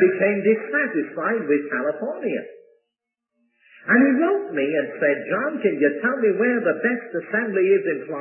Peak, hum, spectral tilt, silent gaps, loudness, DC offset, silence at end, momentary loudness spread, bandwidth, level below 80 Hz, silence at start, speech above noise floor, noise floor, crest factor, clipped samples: -4 dBFS; none; -11 dB/octave; none; -21 LUFS; under 0.1%; 0 s; 8 LU; 3.1 kHz; -78 dBFS; 0 s; 61 dB; -82 dBFS; 16 dB; under 0.1%